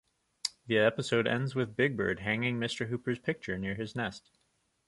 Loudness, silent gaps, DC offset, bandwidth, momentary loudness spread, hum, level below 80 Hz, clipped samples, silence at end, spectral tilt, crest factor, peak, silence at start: -32 LUFS; none; under 0.1%; 11.5 kHz; 10 LU; none; -62 dBFS; under 0.1%; 0.7 s; -5.5 dB/octave; 20 dB; -12 dBFS; 0.45 s